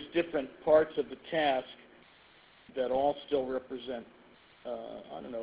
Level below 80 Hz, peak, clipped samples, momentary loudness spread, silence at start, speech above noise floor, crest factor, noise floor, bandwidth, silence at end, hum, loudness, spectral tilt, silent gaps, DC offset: -66 dBFS; -12 dBFS; under 0.1%; 17 LU; 0 s; 28 dB; 20 dB; -60 dBFS; 4 kHz; 0 s; none; -32 LUFS; -3 dB/octave; none; under 0.1%